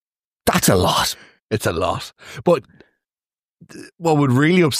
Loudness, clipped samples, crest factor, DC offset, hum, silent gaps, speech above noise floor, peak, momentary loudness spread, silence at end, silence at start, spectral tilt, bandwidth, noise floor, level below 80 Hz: -18 LUFS; under 0.1%; 18 dB; under 0.1%; none; 1.42-1.47 s, 3.39-3.43 s, 3.49-3.55 s; over 72 dB; -2 dBFS; 11 LU; 0 s; 0.45 s; -4.5 dB/octave; 15.5 kHz; under -90 dBFS; -46 dBFS